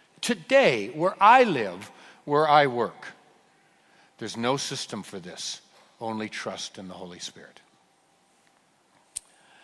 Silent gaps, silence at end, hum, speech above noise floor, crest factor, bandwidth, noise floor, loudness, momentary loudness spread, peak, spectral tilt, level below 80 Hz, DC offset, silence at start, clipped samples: none; 2.2 s; none; 40 dB; 22 dB; 12 kHz; -64 dBFS; -24 LUFS; 21 LU; -4 dBFS; -4 dB/octave; -74 dBFS; under 0.1%; 0.2 s; under 0.1%